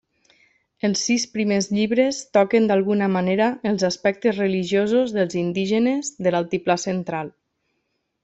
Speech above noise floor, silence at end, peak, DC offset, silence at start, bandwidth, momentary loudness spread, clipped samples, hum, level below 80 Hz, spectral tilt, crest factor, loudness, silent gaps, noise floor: 53 dB; 0.95 s; -4 dBFS; under 0.1%; 0.85 s; 8.2 kHz; 5 LU; under 0.1%; none; -62 dBFS; -5 dB/octave; 16 dB; -21 LUFS; none; -74 dBFS